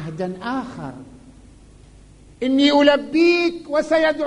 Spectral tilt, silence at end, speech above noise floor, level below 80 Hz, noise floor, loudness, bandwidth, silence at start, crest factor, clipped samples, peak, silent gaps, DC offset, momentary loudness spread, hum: -5 dB/octave; 0 s; 28 dB; -50 dBFS; -46 dBFS; -18 LUFS; 10.5 kHz; 0 s; 18 dB; under 0.1%; -2 dBFS; none; under 0.1%; 15 LU; none